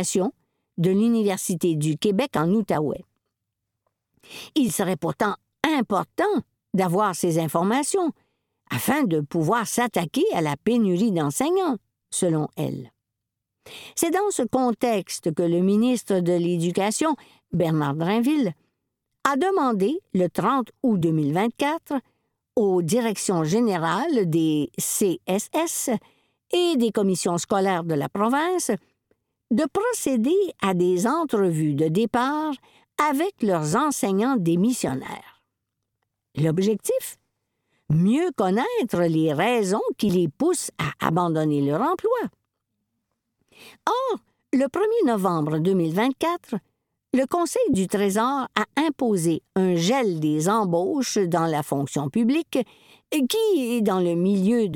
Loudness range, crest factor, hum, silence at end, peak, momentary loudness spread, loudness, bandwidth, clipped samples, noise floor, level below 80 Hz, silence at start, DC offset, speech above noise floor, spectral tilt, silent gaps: 3 LU; 22 dB; none; 0 s; -2 dBFS; 7 LU; -23 LUFS; 19 kHz; under 0.1%; -83 dBFS; -62 dBFS; 0 s; under 0.1%; 61 dB; -5.5 dB/octave; none